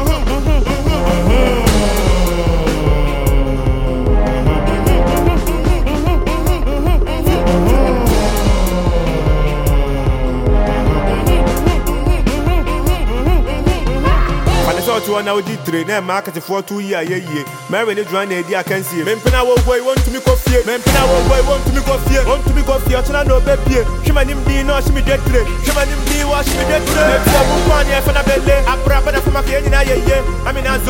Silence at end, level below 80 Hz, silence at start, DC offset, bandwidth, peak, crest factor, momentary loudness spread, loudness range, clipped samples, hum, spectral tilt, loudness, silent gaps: 0 s; -16 dBFS; 0 s; under 0.1%; 17 kHz; 0 dBFS; 12 dB; 5 LU; 3 LU; under 0.1%; none; -5.5 dB/octave; -15 LUFS; none